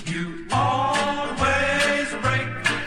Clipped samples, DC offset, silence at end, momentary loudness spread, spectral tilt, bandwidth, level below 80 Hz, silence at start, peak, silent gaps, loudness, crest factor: under 0.1%; under 0.1%; 0 s; 6 LU; -4 dB/octave; 15 kHz; -44 dBFS; 0 s; -8 dBFS; none; -22 LUFS; 16 dB